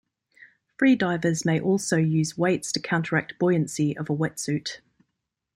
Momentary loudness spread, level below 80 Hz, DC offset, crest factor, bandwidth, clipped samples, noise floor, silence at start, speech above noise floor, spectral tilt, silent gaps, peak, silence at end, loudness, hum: 7 LU; -64 dBFS; under 0.1%; 18 dB; 14.5 kHz; under 0.1%; -81 dBFS; 0.4 s; 57 dB; -5.5 dB/octave; none; -8 dBFS; 0.8 s; -24 LUFS; none